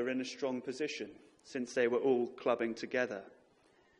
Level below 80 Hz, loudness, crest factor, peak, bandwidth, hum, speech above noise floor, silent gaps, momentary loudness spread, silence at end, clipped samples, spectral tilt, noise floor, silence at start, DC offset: -80 dBFS; -36 LUFS; 18 dB; -18 dBFS; 11 kHz; none; 32 dB; none; 12 LU; 0.7 s; under 0.1%; -4.5 dB/octave; -68 dBFS; 0 s; under 0.1%